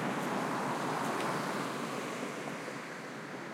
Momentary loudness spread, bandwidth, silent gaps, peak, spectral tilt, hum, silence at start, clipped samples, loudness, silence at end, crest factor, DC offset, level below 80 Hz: 8 LU; 16.5 kHz; none; -22 dBFS; -4.5 dB/octave; none; 0 s; under 0.1%; -36 LUFS; 0 s; 14 dB; under 0.1%; -84 dBFS